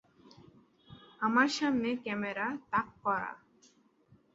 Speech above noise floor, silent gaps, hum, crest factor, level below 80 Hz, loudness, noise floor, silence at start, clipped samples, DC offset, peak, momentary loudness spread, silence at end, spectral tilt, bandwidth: 34 dB; none; none; 22 dB; -70 dBFS; -32 LUFS; -66 dBFS; 0.9 s; under 0.1%; under 0.1%; -14 dBFS; 8 LU; 1 s; -4.5 dB/octave; 8 kHz